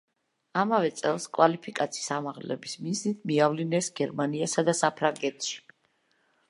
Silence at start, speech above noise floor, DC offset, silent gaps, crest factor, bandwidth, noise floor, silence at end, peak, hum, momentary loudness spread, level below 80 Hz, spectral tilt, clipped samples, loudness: 0.55 s; 43 dB; under 0.1%; none; 22 dB; 11.5 kHz; -71 dBFS; 0.9 s; -6 dBFS; none; 10 LU; -80 dBFS; -4.5 dB/octave; under 0.1%; -28 LUFS